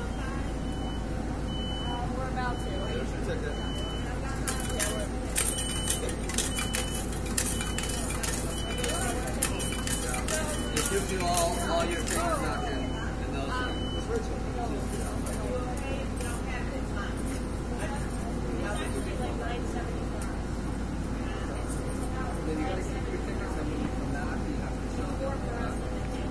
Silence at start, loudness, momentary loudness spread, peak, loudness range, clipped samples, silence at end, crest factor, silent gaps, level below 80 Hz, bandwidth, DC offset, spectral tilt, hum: 0 s; -31 LUFS; 6 LU; -8 dBFS; 5 LU; under 0.1%; 0 s; 22 dB; none; -36 dBFS; 11 kHz; 0.3%; -4 dB/octave; none